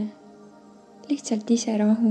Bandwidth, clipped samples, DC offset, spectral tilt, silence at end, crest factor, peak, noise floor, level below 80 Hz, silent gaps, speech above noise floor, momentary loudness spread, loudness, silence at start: 9.4 kHz; under 0.1%; under 0.1%; -5.5 dB/octave; 0 s; 16 dB; -10 dBFS; -50 dBFS; -78 dBFS; none; 28 dB; 9 LU; -24 LUFS; 0 s